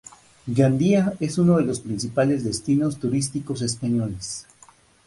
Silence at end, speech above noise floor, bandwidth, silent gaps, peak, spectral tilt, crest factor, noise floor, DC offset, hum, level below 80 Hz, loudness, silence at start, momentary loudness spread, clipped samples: 0.65 s; 32 dB; 11.5 kHz; none; -6 dBFS; -6 dB/octave; 18 dB; -54 dBFS; under 0.1%; none; -52 dBFS; -23 LUFS; 0.45 s; 10 LU; under 0.1%